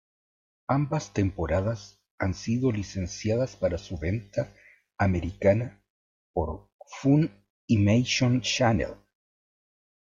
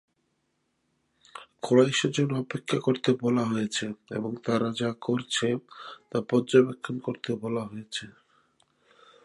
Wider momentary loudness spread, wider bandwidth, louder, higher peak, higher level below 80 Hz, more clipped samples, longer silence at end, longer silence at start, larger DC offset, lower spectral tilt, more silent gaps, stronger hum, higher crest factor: second, 11 LU vs 14 LU; second, 7.6 kHz vs 11.5 kHz; about the same, -27 LUFS vs -27 LUFS; about the same, -8 dBFS vs -8 dBFS; first, -48 dBFS vs -72 dBFS; neither; about the same, 1.1 s vs 1.15 s; second, 0.7 s vs 1.35 s; neither; about the same, -6 dB/octave vs -5 dB/octave; first, 2.11-2.18 s, 5.90-6.34 s, 6.72-6.79 s, 7.50-7.68 s vs none; neither; about the same, 18 dB vs 20 dB